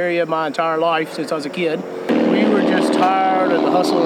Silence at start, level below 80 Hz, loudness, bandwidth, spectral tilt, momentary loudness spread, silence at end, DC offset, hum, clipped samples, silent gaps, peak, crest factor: 0 s; -64 dBFS; -17 LUFS; 14 kHz; -5.5 dB/octave; 7 LU; 0 s; under 0.1%; none; under 0.1%; none; -4 dBFS; 14 dB